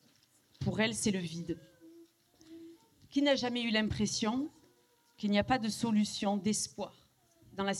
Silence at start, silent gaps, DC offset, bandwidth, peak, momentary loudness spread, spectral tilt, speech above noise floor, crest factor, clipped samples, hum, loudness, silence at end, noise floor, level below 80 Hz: 0.6 s; none; under 0.1%; 13 kHz; -16 dBFS; 14 LU; -4 dB/octave; 36 dB; 20 dB; under 0.1%; none; -33 LUFS; 0 s; -69 dBFS; -62 dBFS